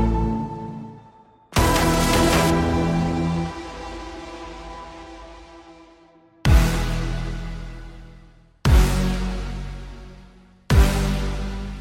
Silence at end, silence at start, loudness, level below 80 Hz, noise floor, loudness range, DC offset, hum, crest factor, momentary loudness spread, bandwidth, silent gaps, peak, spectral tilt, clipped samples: 0 s; 0 s; -22 LUFS; -26 dBFS; -53 dBFS; 7 LU; under 0.1%; none; 18 dB; 21 LU; 16.5 kHz; none; -4 dBFS; -5.5 dB/octave; under 0.1%